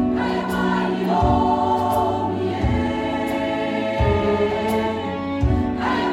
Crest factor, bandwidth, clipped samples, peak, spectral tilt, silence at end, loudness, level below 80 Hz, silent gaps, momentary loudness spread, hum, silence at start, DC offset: 14 dB; 16 kHz; under 0.1%; -6 dBFS; -7 dB/octave; 0 s; -21 LUFS; -34 dBFS; none; 5 LU; none; 0 s; under 0.1%